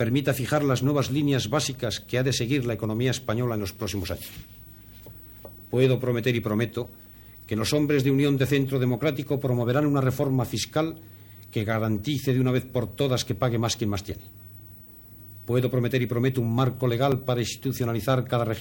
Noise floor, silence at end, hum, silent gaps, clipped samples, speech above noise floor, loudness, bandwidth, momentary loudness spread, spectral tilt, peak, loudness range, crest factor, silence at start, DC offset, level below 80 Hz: -47 dBFS; 0 s; none; none; under 0.1%; 22 dB; -25 LUFS; 17 kHz; 21 LU; -6 dB/octave; -8 dBFS; 4 LU; 16 dB; 0 s; under 0.1%; -52 dBFS